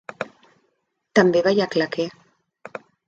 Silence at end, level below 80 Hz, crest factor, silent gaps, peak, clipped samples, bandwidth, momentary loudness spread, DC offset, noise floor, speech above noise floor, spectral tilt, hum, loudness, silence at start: 1 s; -66 dBFS; 22 dB; none; -2 dBFS; under 0.1%; 7.8 kHz; 21 LU; under 0.1%; -72 dBFS; 53 dB; -5.5 dB/octave; none; -20 LUFS; 0.2 s